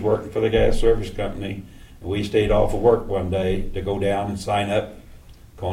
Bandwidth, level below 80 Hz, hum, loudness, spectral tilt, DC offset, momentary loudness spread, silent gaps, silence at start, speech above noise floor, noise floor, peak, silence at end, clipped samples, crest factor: 14 kHz; -30 dBFS; none; -22 LUFS; -6.5 dB/octave; under 0.1%; 13 LU; none; 0 s; 23 dB; -44 dBFS; -4 dBFS; 0 s; under 0.1%; 16 dB